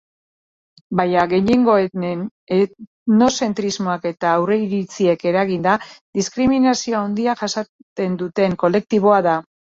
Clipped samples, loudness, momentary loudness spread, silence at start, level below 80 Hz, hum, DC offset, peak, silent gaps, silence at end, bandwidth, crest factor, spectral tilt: under 0.1%; -18 LUFS; 9 LU; 0.9 s; -54 dBFS; none; under 0.1%; -2 dBFS; 2.31-2.47 s, 2.87-3.06 s, 6.01-6.13 s, 7.69-7.96 s; 0.3 s; 7.8 kHz; 16 dB; -5.5 dB/octave